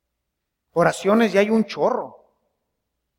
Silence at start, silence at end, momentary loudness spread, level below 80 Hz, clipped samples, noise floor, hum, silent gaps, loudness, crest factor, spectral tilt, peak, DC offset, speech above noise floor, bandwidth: 0.75 s; 1.1 s; 11 LU; -64 dBFS; under 0.1%; -79 dBFS; none; none; -20 LUFS; 20 dB; -5.5 dB/octave; -2 dBFS; under 0.1%; 60 dB; 15.5 kHz